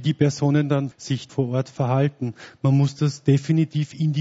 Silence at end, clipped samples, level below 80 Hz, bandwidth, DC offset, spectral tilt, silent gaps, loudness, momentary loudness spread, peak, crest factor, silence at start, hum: 0 s; under 0.1%; -60 dBFS; 8 kHz; under 0.1%; -7.5 dB/octave; none; -22 LUFS; 7 LU; -6 dBFS; 16 dB; 0 s; none